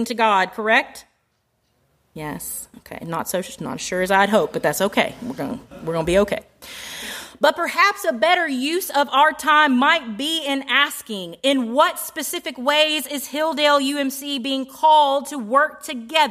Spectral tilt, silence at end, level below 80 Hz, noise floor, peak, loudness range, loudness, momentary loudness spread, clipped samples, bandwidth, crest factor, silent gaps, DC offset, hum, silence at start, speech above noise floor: -3 dB/octave; 0 s; -52 dBFS; -68 dBFS; -2 dBFS; 6 LU; -19 LUFS; 14 LU; under 0.1%; 15.5 kHz; 18 dB; none; under 0.1%; none; 0 s; 48 dB